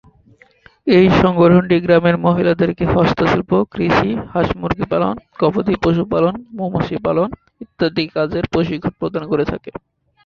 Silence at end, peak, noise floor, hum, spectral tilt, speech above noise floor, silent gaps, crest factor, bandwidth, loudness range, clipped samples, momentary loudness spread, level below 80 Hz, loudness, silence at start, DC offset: 0.55 s; -2 dBFS; -50 dBFS; none; -8 dB/octave; 35 dB; none; 14 dB; 6.8 kHz; 6 LU; under 0.1%; 11 LU; -38 dBFS; -16 LUFS; 0.85 s; under 0.1%